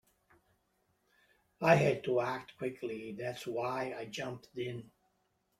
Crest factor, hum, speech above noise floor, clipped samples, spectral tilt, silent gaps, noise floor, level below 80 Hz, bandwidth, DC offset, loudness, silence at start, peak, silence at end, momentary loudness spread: 24 dB; none; 44 dB; under 0.1%; -6 dB/octave; none; -78 dBFS; -72 dBFS; 15.5 kHz; under 0.1%; -35 LUFS; 1.6 s; -12 dBFS; 0.75 s; 14 LU